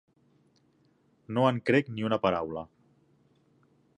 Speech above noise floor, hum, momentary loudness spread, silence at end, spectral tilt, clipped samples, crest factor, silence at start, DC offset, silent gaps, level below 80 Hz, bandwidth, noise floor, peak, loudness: 40 dB; none; 13 LU; 1.3 s; -7.5 dB/octave; under 0.1%; 22 dB; 1.3 s; under 0.1%; none; -64 dBFS; 10 kHz; -67 dBFS; -10 dBFS; -28 LUFS